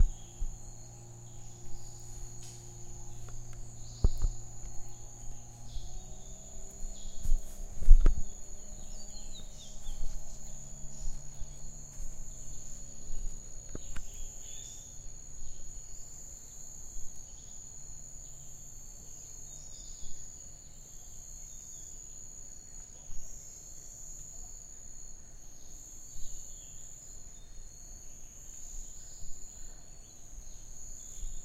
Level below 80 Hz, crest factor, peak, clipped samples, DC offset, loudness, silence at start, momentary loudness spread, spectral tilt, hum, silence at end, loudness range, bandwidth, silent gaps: -36 dBFS; 28 dB; -4 dBFS; under 0.1%; under 0.1%; -43 LUFS; 0 s; 8 LU; -3.5 dB/octave; none; 0 s; 11 LU; 14 kHz; none